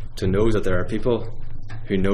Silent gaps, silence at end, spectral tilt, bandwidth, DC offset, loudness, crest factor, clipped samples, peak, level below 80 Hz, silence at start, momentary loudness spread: none; 0 s; -7.5 dB/octave; 9.2 kHz; under 0.1%; -23 LUFS; 14 dB; under 0.1%; -6 dBFS; -28 dBFS; 0 s; 17 LU